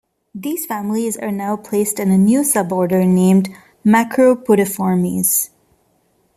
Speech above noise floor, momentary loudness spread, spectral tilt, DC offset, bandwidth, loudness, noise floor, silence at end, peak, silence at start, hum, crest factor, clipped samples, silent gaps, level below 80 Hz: 45 dB; 10 LU; -6 dB/octave; under 0.1%; 15 kHz; -16 LUFS; -60 dBFS; 0.9 s; -2 dBFS; 0.35 s; none; 14 dB; under 0.1%; none; -58 dBFS